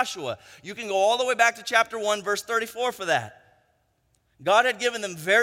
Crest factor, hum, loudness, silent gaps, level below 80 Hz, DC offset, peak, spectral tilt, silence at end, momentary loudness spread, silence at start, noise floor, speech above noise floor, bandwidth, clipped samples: 22 dB; none; -24 LUFS; none; -72 dBFS; under 0.1%; -4 dBFS; -2 dB/octave; 0 s; 14 LU; 0 s; -69 dBFS; 45 dB; 16.5 kHz; under 0.1%